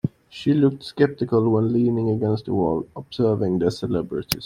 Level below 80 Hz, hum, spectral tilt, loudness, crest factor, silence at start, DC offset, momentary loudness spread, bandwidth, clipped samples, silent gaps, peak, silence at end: -52 dBFS; none; -7 dB/octave; -22 LUFS; 22 dB; 0.05 s; under 0.1%; 7 LU; 16 kHz; under 0.1%; none; 0 dBFS; 0 s